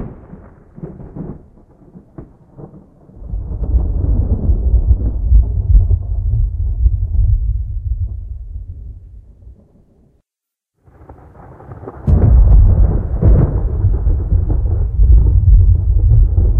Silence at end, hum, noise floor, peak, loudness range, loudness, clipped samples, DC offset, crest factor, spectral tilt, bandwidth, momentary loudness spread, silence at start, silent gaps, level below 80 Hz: 0 s; none; -84 dBFS; 0 dBFS; 17 LU; -15 LUFS; under 0.1%; under 0.1%; 14 dB; -13.5 dB/octave; 1.7 kHz; 20 LU; 0 s; none; -14 dBFS